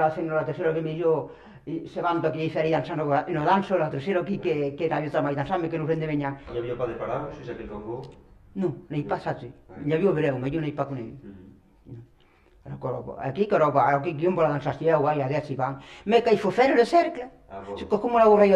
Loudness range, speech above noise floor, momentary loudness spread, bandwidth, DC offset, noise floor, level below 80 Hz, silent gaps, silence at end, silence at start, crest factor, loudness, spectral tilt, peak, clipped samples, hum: 8 LU; 33 dB; 16 LU; 10.5 kHz; under 0.1%; -58 dBFS; -56 dBFS; none; 0 s; 0 s; 20 dB; -25 LUFS; -7.5 dB/octave; -6 dBFS; under 0.1%; none